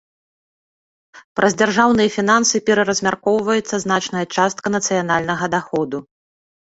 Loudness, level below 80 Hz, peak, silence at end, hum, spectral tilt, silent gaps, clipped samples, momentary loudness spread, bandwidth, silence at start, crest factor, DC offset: -17 LUFS; -54 dBFS; -2 dBFS; 0.75 s; none; -3.5 dB/octave; 1.24-1.35 s; under 0.1%; 7 LU; 8 kHz; 1.15 s; 18 dB; under 0.1%